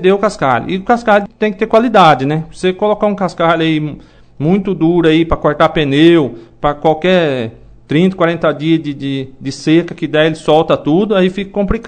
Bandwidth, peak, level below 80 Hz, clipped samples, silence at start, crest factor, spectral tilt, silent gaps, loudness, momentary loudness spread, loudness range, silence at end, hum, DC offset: 9.2 kHz; 0 dBFS; -36 dBFS; 0.4%; 0 s; 12 dB; -7 dB/octave; none; -13 LUFS; 9 LU; 3 LU; 0 s; none; under 0.1%